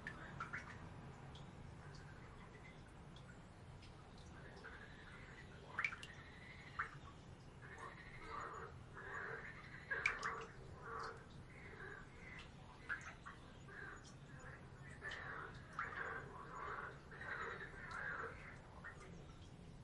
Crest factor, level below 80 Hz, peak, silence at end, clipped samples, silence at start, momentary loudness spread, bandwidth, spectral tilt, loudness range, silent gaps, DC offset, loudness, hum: 28 dB; -66 dBFS; -22 dBFS; 0 s; under 0.1%; 0 s; 12 LU; 11 kHz; -4.5 dB/octave; 10 LU; none; under 0.1%; -51 LUFS; none